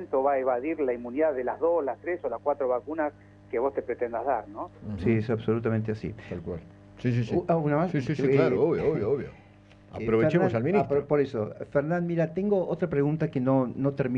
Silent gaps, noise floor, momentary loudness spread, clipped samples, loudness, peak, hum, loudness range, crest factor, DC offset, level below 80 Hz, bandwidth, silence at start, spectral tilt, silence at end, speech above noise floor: none; -53 dBFS; 10 LU; under 0.1%; -27 LUFS; -10 dBFS; 50 Hz at -55 dBFS; 4 LU; 16 dB; under 0.1%; -56 dBFS; 7.4 kHz; 0 s; -9.5 dB/octave; 0 s; 27 dB